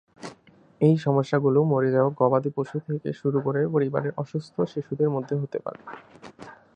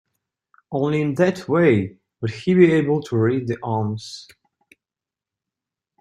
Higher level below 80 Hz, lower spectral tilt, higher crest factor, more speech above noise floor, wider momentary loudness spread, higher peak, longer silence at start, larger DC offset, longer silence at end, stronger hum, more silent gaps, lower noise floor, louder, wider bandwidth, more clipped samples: second, -68 dBFS vs -60 dBFS; first, -9 dB/octave vs -7.5 dB/octave; about the same, 18 dB vs 20 dB; second, 29 dB vs 70 dB; first, 21 LU vs 15 LU; second, -6 dBFS vs -2 dBFS; second, 0.2 s vs 0.7 s; neither; second, 0.2 s vs 1.8 s; neither; neither; second, -54 dBFS vs -89 dBFS; second, -25 LUFS vs -20 LUFS; second, 8.8 kHz vs 10.5 kHz; neither